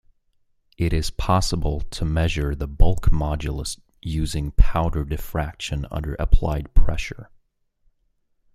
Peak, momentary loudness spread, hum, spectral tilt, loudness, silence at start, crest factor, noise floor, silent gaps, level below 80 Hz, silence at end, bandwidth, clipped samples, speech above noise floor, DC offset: -2 dBFS; 8 LU; none; -5.5 dB/octave; -25 LUFS; 0.8 s; 18 dB; -67 dBFS; none; -24 dBFS; 1.3 s; 13.5 kHz; under 0.1%; 48 dB; under 0.1%